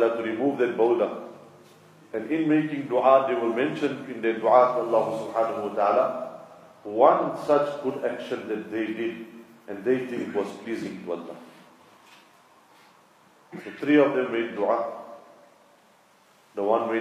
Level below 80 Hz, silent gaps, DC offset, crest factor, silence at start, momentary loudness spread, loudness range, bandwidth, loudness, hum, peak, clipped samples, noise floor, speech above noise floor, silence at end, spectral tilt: -80 dBFS; none; under 0.1%; 22 dB; 0 s; 20 LU; 9 LU; 13 kHz; -25 LUFS; none; -4 dBFS; under 0.1%; -59 dBFS; 34 dB; 0 s; -6.5 dB/octave